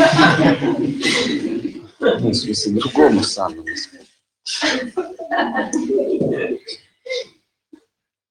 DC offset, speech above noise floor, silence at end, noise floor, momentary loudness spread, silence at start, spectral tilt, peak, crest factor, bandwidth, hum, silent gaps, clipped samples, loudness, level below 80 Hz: under 0.1%; 51 dB; 1.05 s; -69 dBFS; 15 LU; 0 s; -4.5 dB/octave; 0 dBFS; 18 dB; 11.5 kHz; none; none; under 0.1%; -18 LUFS; -52 dBFS